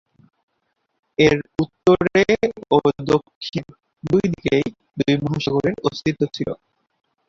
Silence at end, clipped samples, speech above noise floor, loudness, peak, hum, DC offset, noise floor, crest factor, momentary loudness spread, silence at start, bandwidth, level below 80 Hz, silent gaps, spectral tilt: 0.75 s; under 0.1%; 53 dB; -20 LUFS; -2 dBFS; none; under 0.1%; -72 dBFS; 20 dB; 12 LU; 1.2 s; 7.6 kHz; -50 dBFS; 3.35-3.41 s; -6.5 dB/octave